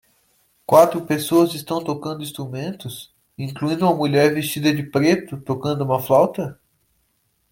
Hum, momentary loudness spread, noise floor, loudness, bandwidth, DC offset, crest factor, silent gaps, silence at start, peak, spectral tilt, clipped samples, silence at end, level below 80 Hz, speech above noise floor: none; 15 LU; -67 dBFS; -20 LUFS; 17 kHz; under 0.1%; 20 dB; none; 0.7 s; -2 dBFS; -6 dB/octave; under 0.1%; 1 s; -60 dBFS; 48 dB